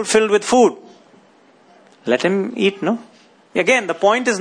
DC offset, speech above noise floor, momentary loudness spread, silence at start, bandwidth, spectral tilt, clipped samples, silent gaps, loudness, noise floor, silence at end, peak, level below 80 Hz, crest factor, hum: under 0.1%; 35 dB; 8 LU; 0 s; 10.5 kHz; -3.5 dB/octave; under 0.1%; none; -17 LUFS; -51 dBFS; 0 s; -2 dBFS; -62 dBFS; 18 dB; none